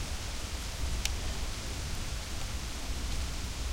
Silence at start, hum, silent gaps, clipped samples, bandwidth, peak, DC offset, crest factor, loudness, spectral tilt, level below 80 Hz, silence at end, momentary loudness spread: 0 s; none; none; under 0.1%; 16 kHz; -10 dBFS; under 0.1%; 26 dB; -37 LUFS; -3 dB/octave; -38 dBFS; 0 s; 4 LU